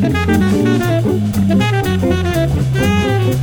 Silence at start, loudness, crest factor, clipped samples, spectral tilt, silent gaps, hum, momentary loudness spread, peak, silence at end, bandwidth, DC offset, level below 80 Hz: 0 s; -14 LUFS; 12 dB; under 0.1%; -6.5 dB/octave; none; none; 2 LU; -2 dBFS; 0 s; over 20 kHz; under 0.1%; -30 dBFS